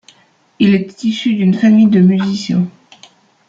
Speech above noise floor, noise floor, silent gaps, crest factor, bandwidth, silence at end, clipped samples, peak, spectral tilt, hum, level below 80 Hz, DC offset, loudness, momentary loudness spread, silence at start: 40 dB; -52 dBFS; none; 12 dB; 7.6 kHz; 0.8 s; under 0.1%; -2 dBFS; -7 dB/octave; none; -56 dBFS; under 0.1%; -13 LUFS; 9 LU; 0.6 s